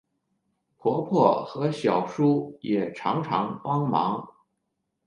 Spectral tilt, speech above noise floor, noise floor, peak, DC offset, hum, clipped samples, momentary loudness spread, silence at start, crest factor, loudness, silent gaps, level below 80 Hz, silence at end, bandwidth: -8 dB/octave; 54 dB; -79 dBFS; -6 dBFS; under 0.1%; none; under 0.1%; 7 LU; 0.85 s; 22 dB; -25 LUFS; none; -70 dBFS; 0.8 s; 10.5 kHz